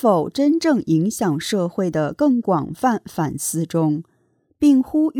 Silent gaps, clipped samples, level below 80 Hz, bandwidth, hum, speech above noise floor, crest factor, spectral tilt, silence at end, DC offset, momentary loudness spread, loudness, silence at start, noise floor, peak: none; under 0.1%; -56 dBFS; 18.5 kHz; none; 45 dB; 14 dB; -6 dB/octave; 0 s; under 0.1%; 6 LU; -20 LUFS; 0 s; -63 dBFS; -4 dBFS